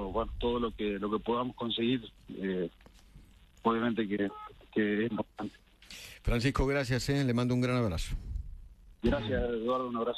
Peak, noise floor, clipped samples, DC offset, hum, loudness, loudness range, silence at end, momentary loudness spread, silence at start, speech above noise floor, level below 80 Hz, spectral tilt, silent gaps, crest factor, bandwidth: -14 dBFS; -56 dBFS; under 0.1%; under 0.1%; none; -32 LUFS; 3 LU; 0 s; 14 LU; 0 s; 25 dB; -44 dBFS; -6.5 dB/octave; none; 18 dB; 13 kHz